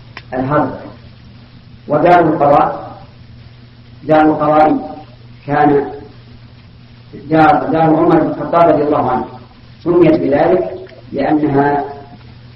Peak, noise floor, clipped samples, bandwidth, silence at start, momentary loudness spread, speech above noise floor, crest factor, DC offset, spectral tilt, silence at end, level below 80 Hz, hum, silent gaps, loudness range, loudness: 0 dBFS; -39 dBFS; under 0.1%; 5.8 kHz; 0.15 s; 19 LU; 27 dB; 14 dB; under 0.1%; -9.5 dB/octave; 0.4 s; -42 dBFS; none; none; 3 LU; -12 LUFS